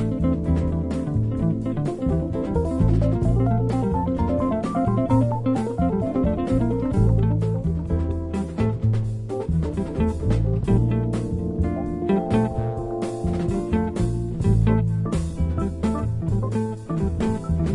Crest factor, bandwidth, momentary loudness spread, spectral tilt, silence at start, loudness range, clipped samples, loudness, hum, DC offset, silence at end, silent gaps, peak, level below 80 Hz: 16 dB; 11 kHz; 5 LU; -9 dB/octave; 0 s; 2 LU; under 0.1%; -23 LUFS; none; under 0.1%; 0 s; none; -6 dBFS; -32 dBFS